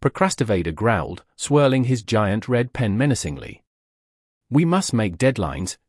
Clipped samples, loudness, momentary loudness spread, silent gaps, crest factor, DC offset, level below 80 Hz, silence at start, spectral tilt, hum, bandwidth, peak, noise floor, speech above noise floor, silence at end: under 0.1%; -21 LUFS; 9 LU; 3.67-4.41 s; 16 dB; under 0.1%; -46 dBFS; 0 s; -6 dB/octave; none; 12 kHz; -4 dBFS; under -90 dBFS; over 70 dB; 0.15 s